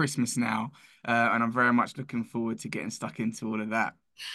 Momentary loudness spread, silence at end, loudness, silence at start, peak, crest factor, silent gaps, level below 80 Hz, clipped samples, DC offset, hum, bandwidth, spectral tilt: 11 LU; 0 s; -29 LUFS; 0 s; -12 dBFS; 18 dB; none; -72 dBFS; under 0.1%; under 0.1%; none; 12.5 kHz; -4.5 dB/octave